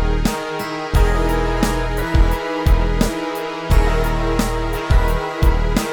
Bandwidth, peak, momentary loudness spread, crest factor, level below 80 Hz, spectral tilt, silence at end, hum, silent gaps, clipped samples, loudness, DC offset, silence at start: 19 kHz; -2 dBFS; 6 LU; 14 dB; -18 dBFS; -6 dB/octave; 0 s; none; none; under 0.1%; -19 LUFS; under 0.1%; 0 s